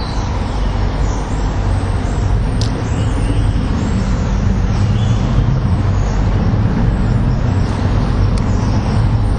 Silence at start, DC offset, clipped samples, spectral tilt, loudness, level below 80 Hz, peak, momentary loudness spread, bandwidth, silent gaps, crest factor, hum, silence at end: 0 s; under 0.1%; under 0.1%; -7 dB/octave; -16 LUFS; -18 dBFS; 0 dBFS; 4 LU; 9.4 kHz; none; 14 dB; none; 0 s